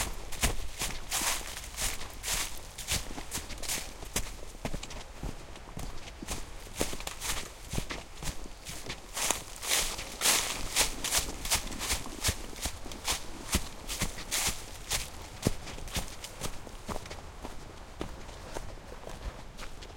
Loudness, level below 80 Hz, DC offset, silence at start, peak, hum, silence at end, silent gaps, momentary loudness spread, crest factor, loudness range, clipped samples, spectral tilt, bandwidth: -34 LUFS; -42 dBFS; under 0.1%; 0 s; -8 dBFS; none; 0 s; none; 16 LU; 28 dB; 10 LU; under 0.1%; -1.5 dB/octave; 17 kHz